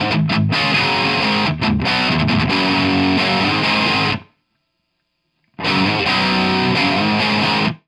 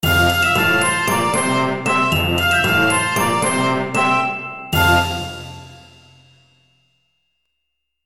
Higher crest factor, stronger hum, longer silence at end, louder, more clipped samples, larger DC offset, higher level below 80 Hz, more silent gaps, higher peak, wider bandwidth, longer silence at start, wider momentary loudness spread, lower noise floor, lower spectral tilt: about the same, 14 dB vs 16 dB; neither; second, 0.1 s vs 2.15 s; about the same, -16 LUFS vs -16 LUFS; neither; neither; about the same, -42 dBFS vs -40 dBFS; neither; about the same, -4 dBFS vs -2 dBFS; second, 12 kHz vs 18 kHz; about the same, 0 s vs 0 s; second, 3 LU vs 10 LU; second, -71 dBFS vs -76 dBFS; first, -5.5 dB/octave vs -3.5 dB/octave